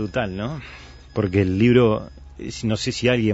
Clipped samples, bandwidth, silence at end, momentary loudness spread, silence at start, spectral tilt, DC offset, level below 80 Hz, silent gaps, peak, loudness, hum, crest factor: under 0.1%; 8 kHz; 0 s; 20 LU; 0 s; -6.5 dB/octave; under 0.1%; -44 dBFS; none; -4 dBFS; -21 LUFS; none; 18 dB